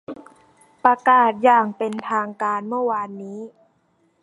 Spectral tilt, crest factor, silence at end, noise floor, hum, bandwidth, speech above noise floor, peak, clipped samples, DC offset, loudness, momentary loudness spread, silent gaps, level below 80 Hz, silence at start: -6 dB/octave; 20 dB; 0.75 s; -64 dBFS; none; 11 kHz; 44 dB; -2 dBFS; under 0.1%; under 0.1%; -19 LUFS; 21 LU; none; -74 dBFS; 0.1 s